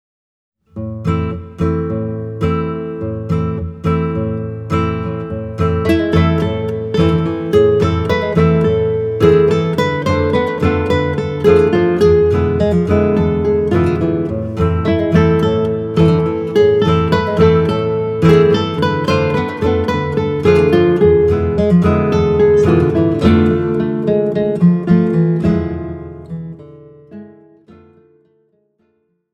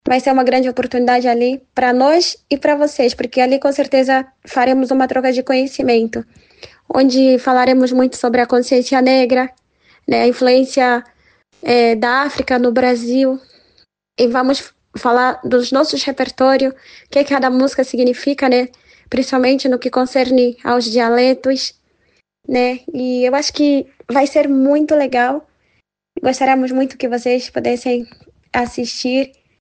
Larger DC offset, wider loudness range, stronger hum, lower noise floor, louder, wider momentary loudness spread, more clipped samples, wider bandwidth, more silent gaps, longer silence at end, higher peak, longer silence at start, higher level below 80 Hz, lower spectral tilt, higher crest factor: neither; first, 7 LU vs 3 LU; neither; about the same, -63 dBFS vs -63 dBFS; about the same, -14 LUFS vs -15 LUFS; about the same, 10 LU vs 8 LU; neither; about the same, 8.6 kHz vs 9.2 kHz; neither; first, 2 s vs 0.35 s; about the same, 0 dBFS vs -2 dBFS; first, 0.75 s vs 0.05 s; first, -32 dBFS vs -54 dBFS; first, -8.5 dB/octave vs -3.5 dB/octave; about the same, 14 dB vs 12 dB